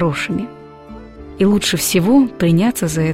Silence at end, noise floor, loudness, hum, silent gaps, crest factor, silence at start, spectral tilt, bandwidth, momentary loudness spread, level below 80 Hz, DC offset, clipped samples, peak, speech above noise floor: 0 s; -36 dBFS; -15 LUFS; none; none; 14 dB; 0 s; -5 dB/octave; 16.5 kHz; 23 LU; -42 dBFS; 0.4%; under 0.1%; -2 dBFS; 21 dB